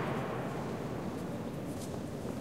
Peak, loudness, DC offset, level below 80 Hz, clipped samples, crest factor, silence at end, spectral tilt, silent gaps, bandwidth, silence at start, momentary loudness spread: -24 dBFS; -39 LUFS; 0.2%; -58 dBFS; under 0.1%; 14 dB; 0 s; -6.5 dB/octave; none; 16 kHz; 0 s; 4 LU